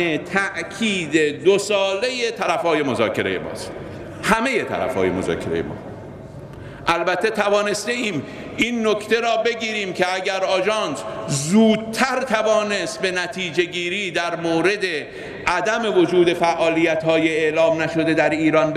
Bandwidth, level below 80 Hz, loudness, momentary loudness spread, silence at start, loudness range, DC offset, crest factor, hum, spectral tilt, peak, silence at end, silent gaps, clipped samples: 14.5 kHz; -52 dBFS; -20 LUFS; 10 LU; 0 s; 4 LU; under 0.1%; 18 dB; none; -4.5 dB/octave; -2 dBFS; 0 s; none; under 0.1%